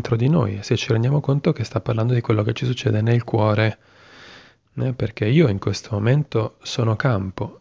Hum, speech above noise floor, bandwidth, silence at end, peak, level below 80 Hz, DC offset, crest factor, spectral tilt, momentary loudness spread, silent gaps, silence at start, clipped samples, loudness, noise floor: none; 27 dB; 7.6 kHz; 0.05 s; -4 dBFS; -46 dBFS; under 0.1%; 16 dB; -7 dB/octave; 7 LU; none; 0 s; under 0.1%; -21 LUFS; -47 dBFS